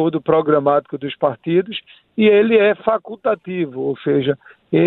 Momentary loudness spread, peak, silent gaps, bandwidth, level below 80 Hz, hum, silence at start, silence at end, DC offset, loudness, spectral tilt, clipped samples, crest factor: 13 LU; -2 dBFS; none; 4.1 kHz; -60 dBFS; none; 0 s; 0 s; under 0.1%; -18 LUFS; -10.5 dB/octave; under 0.1%; 16 dB